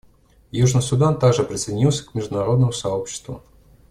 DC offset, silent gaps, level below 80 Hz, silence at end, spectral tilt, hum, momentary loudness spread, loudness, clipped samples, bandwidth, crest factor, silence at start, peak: under 0.1%; none; -46 dBFS; 0.5 s; -6 dB/octave; none; 13 LU; -20 LUFS; under 0.1%; 12 kHz; 16 dB; 0.55 s; -4 dBFS